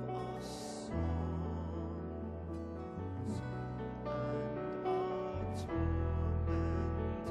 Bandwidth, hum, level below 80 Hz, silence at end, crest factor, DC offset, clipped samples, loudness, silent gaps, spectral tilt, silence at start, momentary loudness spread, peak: 11.5 kHz; none; -46 dBFS; 0 s; 14 dB; under 0.1%; under 0.1%; -39 LUFS; none; -7.5 dB/octave; 0 s; 8 LU; -24 dBFS